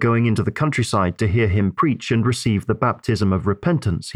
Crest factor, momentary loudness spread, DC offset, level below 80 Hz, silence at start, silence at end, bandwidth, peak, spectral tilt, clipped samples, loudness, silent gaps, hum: 14 dB; 3 LU; 0.1%; -42 dBFS; 0 s; 0 s; 13 kHz; -4 dBFS; -6.5 dB/octave; under 0.1%; -20 LUFS; none; none